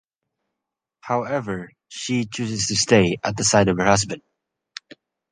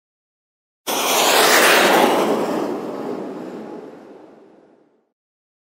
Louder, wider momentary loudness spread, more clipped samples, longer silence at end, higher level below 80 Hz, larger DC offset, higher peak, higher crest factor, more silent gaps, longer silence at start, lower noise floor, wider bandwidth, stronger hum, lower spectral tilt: second, -20 LUFS vs -15 LUFS; about the same, 21 LU vs 21 LU; neither; second, 1.15 s vs 1.5 s; first, -50 dBFS vs -68 dBFS; neither; about the same, -2 dBFS vs -2 dBFS; about the same, 22 dB vs 18 dB; neither; first, 1.05 s vs 0.85 s; first, -84 dBFS vs -55 dBFS; second, 10 kHz vs 16.5 kHz; neither; first, -4 dB/octave vs -1.5 dB/octave